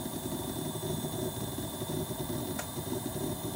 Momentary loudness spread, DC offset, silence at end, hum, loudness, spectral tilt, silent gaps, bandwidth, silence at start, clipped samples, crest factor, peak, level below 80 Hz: 1 LU; under 0.1%; 0 s; none; -36 LUFS; -4.5 dB/octave; none; 17 kHz; 0 s; under 0.1%; 14 dB; -22 dBFS; -54 dBFS